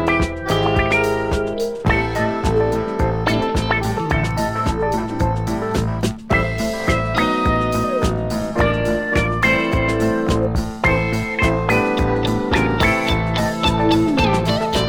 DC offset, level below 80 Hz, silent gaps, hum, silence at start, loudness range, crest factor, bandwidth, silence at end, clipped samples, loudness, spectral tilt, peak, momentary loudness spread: 0.5%; -28 dBFS; none; none; 0 s; 3 LU; 16 dB; 19 kHz; 0 s; under 0.1%; -19 LUFS; -6 dB/octave; -2 dBFS; 5 LU